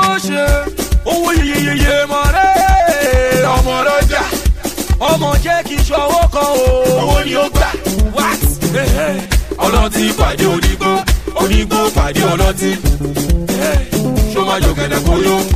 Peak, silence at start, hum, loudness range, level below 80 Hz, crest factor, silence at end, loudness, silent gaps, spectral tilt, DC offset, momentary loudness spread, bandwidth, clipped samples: -2 dBFS; 0 s; none; 2 LU; -18 dBFS; 10 dB; 0 s; -13 LUFS; none; -4.5 dB/octave; 1%; 4 LU; 15.5 kHz; under 0.1%